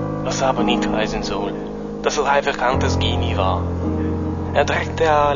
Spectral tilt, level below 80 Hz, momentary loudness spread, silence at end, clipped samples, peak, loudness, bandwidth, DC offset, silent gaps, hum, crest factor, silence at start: -5.5 dB/octave; -34 dBFS; 6 LU; 0 s; under 0.1%; -4 dBFS; -20 LUFS; 7.4 kHz; 0.4%; none; none; 16 dB; 0 s